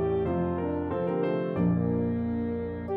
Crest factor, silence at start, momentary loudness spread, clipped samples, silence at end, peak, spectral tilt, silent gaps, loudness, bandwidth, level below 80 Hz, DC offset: 14 dB; 0 s; 4 LU; under 0.1%; 0 s; -14 dBFS; -11.5 dB/octave; none; -29 LUFS; 4.4 kHz; -48 dBFS; under 0.1%